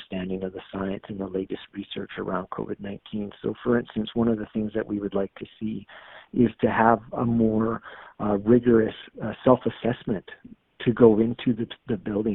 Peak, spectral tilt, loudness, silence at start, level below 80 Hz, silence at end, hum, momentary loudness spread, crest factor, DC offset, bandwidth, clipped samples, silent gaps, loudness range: -2 dBFS; -6.5 dB/octave; -25 LUFS; 0 s; -52 dBFS; 0 s; none; 15 LU; 22 dB; under 0.1%; 4 kHz; under 0.1%; none; 8 LU